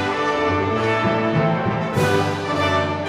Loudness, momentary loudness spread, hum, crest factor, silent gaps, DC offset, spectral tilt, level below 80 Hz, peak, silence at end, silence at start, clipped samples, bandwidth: -20 LUFS; 2 LU; none; 14 dB; none; under 0.1%; -6 dB/octave; -48 dBFS; -6 dBFS; 0 s; 0 s; under 0.1%; 15.5 kHz